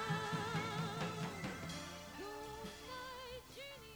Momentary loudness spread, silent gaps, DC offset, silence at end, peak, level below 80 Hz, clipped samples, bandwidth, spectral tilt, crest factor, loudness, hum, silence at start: 10 LU; none; under 0.1%; 0 s; -28 dBFS; -66 dBFS; under 0.1%; over 20 kHz; -4.5 dB/octave; 16 dB; -44 LUFS; none; 0 s